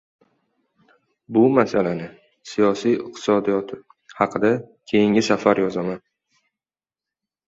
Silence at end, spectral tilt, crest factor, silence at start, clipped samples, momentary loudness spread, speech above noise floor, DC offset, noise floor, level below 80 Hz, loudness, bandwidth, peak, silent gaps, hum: 1.5 s; -6 dB/octave; 20 dB; 1.3 s; under 0.1%; 13 LU; over 70 dB; under 0.1%; under -90 dBFS; -62 dBFS; -20 LUFS; 8 kHz; -2 dBFS; none; none